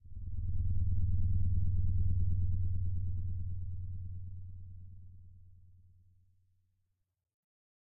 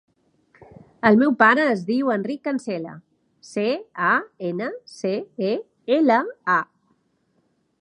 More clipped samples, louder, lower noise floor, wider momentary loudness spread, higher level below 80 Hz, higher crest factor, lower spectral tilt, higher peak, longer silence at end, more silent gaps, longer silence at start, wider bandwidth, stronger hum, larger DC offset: neither; second, -37 LUFS vs -21 LUFS; first, -80 dBFS vs -67 dBFS; first, 18 LU vs 14 LU; first, -40 dBFS vs -68 dBFS; second, 12 dB vs 22 dB; first, -19.5 dB/octave vs -6 dB/octave; second, -22 dBFS vs 0 dBFS; first, 2.45 s vs 1.15 s; neither; second, 0.05 s vs 1.05 s; second, 0.5 kHz vs 10.5 kHz; neither; neither